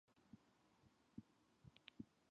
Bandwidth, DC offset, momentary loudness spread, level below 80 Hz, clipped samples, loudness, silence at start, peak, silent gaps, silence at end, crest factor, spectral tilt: 7.6 kHz; under 0.1%; 8 LU; -84 dBFS; under 0.1%; -64 LUFS; 0.05 s; -38 dBFS; none; 0 s; 28 dB; -5 dB/octave